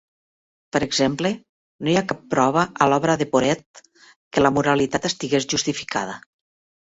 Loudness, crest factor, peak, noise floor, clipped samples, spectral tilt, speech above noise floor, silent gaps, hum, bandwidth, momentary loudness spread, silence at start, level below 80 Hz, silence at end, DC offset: -21 LUFS; 22 dB; 0 dBFS; under -90 dBFS; under 0.1%; -4.5 dB/octave; over 69 dB; 1.49-1.79 s, 3.66-3.74 s, 4.16-4.31 s; none; 8 kHz; 8 LU; 0.75 s; -54 dBFS; 0.65 s; under 0.1%